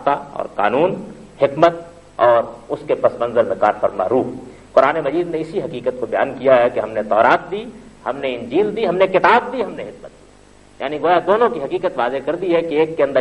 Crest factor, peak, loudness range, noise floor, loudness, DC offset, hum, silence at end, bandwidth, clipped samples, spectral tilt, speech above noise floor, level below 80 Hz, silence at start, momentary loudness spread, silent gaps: 18 dB; 0 dBFS; 2 LU; -46 dBFS; -18 LUFS; under 0.1%; none; 0 s; 10.5 kHz; under 0.1%; -6.5 dB/octave; 29 dB; -52 dBFS; 0 s; 14 LU; none